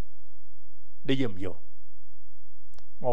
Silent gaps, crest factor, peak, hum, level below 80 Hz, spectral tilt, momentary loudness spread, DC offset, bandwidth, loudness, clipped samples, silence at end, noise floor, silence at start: none; 24 dB; -12 dBFS; none; -62 dBFS; -7 dB/octave; 12 LU; 10%; 10.5 kHz; -33 LUFS; under 0.1%; 0 s; -64 dBFS; 1.05 s